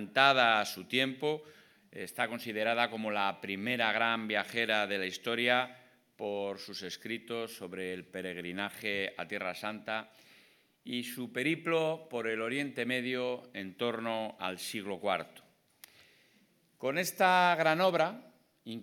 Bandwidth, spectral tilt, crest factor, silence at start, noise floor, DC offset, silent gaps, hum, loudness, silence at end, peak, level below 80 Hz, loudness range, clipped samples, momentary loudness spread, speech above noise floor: 19 kHz; -3.5 dB/octave; 26 dB; 0 s; -69 dBFS; under 0.1%; none; none; -32 LUFS; 0 s; -8 dBFS; -88 dBFS; 7 LU; under 0.1%; 14 LU; 36 dB